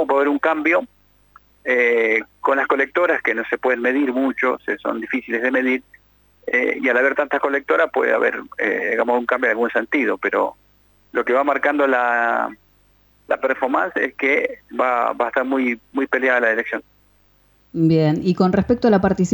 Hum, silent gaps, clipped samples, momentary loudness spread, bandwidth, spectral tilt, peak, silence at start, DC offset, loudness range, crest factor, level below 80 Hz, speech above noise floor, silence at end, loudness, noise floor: 50 Hz at -60 dBFS; none; under 0.1%; 7 LU; 19 kHz; -7 dB/octave; -4 dBFS; 0 s; under 0.1%; 2 LU; 16 dB; -54 dBFS; 38 dB; 0 s; -19 LUFS; -57 dBFS